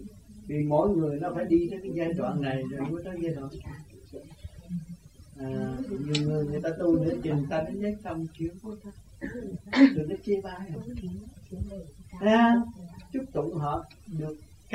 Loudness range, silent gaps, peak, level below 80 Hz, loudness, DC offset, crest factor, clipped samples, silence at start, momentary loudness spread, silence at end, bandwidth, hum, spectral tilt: 7 LU; none; -6 dBFS; -50 dBFS; -29 LUFS; under 0.1%; 22 dB; under 0.1%; 0 s; 22 LU; 0 s; 12 kHz; none; -7.5 dB/octave